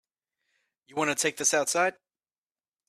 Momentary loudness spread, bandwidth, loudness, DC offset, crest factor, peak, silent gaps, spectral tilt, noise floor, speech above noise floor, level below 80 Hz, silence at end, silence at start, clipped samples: 6 LU; 15 kHz; -26 LUFS; under 0.1%; 20 dB; -10 dBFS; none; -1.5 dB/octave; under -90 dBFS; over 63 dB; -76 dBFS; 0.95 s; 0.95 s; under 0.1%